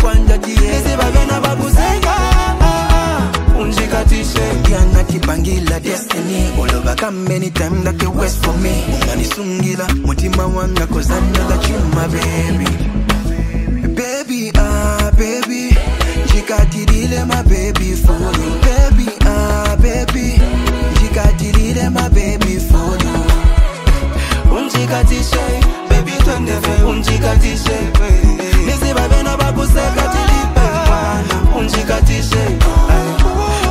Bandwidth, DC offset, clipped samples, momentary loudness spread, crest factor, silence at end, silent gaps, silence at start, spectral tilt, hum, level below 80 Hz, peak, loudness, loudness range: 16 kHz; 0.1%; under 0.1%; 4 LU; 12 dB; 0 s; none; 0 s; -5.5 dB/octave; none; -14 dBFS; 0 dBFS; -14 LUFS; 2 LU